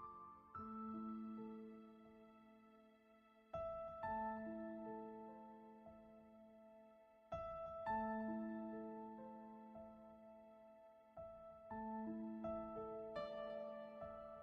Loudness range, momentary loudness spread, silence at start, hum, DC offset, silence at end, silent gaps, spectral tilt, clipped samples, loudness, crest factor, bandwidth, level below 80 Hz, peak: 6 LU; 19 LU; 0 s; none; under 0.1%; 0 s; none; -6 dB/octave; under 0.1%; -51 LUFS; 18 dB; 6.4 kHz; -74 dBFS; -34 dBFS